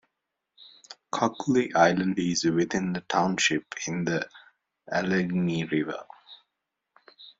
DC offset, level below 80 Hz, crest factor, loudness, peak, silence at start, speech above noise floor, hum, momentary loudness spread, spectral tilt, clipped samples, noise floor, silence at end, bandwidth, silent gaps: under 0.1%; -64 dBFS; 22 dB; -26 LUFS; -6 dBFS; 0.6 s; 57 dB; none; 13 LU; -4.5 dB/octave; under 0.1%; -83 dBFS; 0.1 s; 7.8 kHz; none